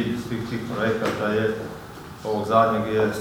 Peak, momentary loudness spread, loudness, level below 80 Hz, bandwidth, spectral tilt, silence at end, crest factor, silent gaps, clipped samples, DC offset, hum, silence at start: -4 dBFS; 15 LU; -24 LUFS; -52 dBFS; 20 kHz; -6 dB/octave; 0 s; 18 dB; none; under 0.1%; under 0.1%; none; 0 s